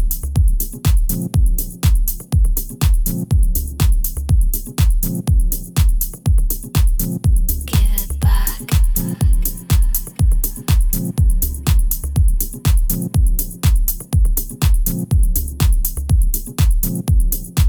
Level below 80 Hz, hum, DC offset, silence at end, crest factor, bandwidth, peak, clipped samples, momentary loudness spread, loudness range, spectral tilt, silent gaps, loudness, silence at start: -16 dBFS; none; under 0.1%; 0 s; 14 dB; over 20 kHz; -2 dBFS; under 0.1%; 3 LU; 0 LU; -5 dB/octave; none; -18 LUFS; 0 s